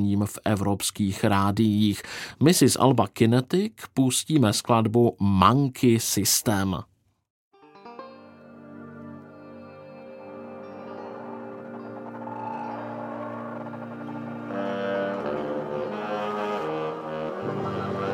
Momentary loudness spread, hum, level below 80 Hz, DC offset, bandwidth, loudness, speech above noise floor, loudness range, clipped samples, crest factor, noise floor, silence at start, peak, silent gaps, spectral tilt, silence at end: 22 LU; none; -60 dBFS; under 0.1%; 17 kHz; -24 LUFS; 25 dB; 20 LU; under 0.1%; 24 dB; -47 dBFS; 0 s; -2 dBFS; 7.30-7.51 s; -5 dB/octave; 0 s